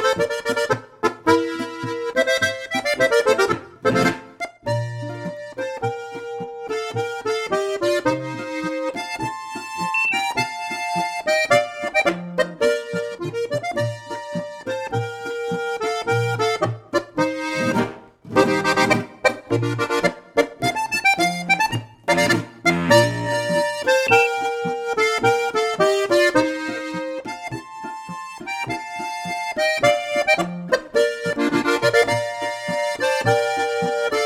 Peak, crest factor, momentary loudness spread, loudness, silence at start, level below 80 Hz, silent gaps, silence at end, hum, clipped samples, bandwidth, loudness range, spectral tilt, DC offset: -2 dBFS; 20 dB; 12 LU; -21 LUFS; 0 s; -56 dBFS; none; 0 s; none; under 0.1%; 16.5 kHz; 6 LU; -4.5 dB/octave; under 0.1%